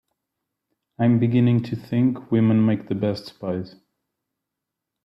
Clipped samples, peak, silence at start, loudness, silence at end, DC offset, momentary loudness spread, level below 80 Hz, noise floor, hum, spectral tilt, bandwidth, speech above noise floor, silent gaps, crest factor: under 0.1%; -8 dBFS; 1 s; -22 LUFS; 1.35 s; under 0.1%; 11 LU; -62 dBFS; -84 dBFS; none; -9.5 dB/octave; 5.8 kHz; 63 dB; none; 16 dB